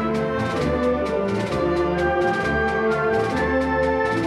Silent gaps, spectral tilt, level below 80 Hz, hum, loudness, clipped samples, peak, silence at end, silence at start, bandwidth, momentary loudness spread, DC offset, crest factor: none; -6.5 dB/octave; -40 dBFS; none; -21 LUFS; under 0.1%; -10 dBFS; 0 s; 0 s; 12.5 kHz; 2 LU; under 0.1%; 12 dB